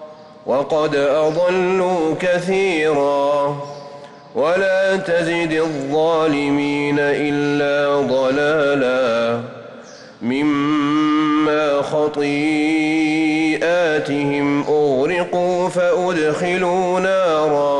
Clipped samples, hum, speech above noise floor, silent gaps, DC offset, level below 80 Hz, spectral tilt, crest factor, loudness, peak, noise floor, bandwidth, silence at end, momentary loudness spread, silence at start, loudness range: under 0.1%; none; 21 dB; none; under 0.1%; -56 dBFS; -5.5 dB/octave; 8 dB; -17 LUFS; -8 dBFS; -38 dBFS; 11 kHz; 0 s; 5 LU; 0 s; 1 LU